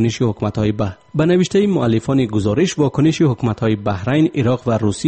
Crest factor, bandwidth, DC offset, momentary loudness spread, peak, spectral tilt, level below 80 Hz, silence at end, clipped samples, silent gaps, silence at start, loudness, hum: 12 dB; 8.8 kHz; under 0.1%; 4 LU; -4 dBFS; -7 dB/octave; -44 dBFS; 0 s; under 0.1%; none; 0 s; -17 LUFS; none